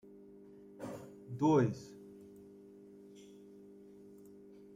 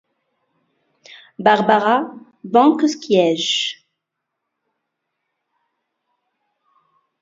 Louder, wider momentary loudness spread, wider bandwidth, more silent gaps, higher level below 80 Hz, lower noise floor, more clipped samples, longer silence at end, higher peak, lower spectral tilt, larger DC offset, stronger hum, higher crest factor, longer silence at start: second, -35 LUFS vs -16 LUFS; first, 26 LU vs 14 LU; first, 14 kHz vs 7.8 kHz; neither; second, -74 dBFS vs -68 dBFS; second, -56 dBFS vs -79 dBFS; neither; second, 1.5 s vs 3.5 s; second, -18 dBFS vs 0 dBFS; first, -8 dB/octave vs -4 dB/octave; neither; first, 50 Hz at -60 dBFS vs none; about the same, 22 dB vs 20 dB; second, 0.8 s vs 1.4 s